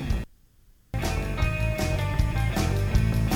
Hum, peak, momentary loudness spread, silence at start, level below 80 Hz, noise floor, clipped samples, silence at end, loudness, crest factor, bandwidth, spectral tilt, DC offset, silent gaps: none; -10 dBFS; 8 LU; 0 s; -30 dBFS; -57 dBFS; under 0.1%; 0 s; -27 LUFS; 16 dB; 19 kHz; -6 dB/octave; under 0.1%; none